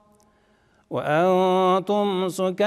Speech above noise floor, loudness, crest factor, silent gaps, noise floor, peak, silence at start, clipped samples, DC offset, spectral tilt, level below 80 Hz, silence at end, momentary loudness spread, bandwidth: 40 dB; -22 LUFS; 14 dB; none; -61 dBFS; -10 dBFS; 0.9 s; under 0.1%; under 0.1%; -6 dB/octave; -70 dBFS; 0 s; 8 LU; 14 kHz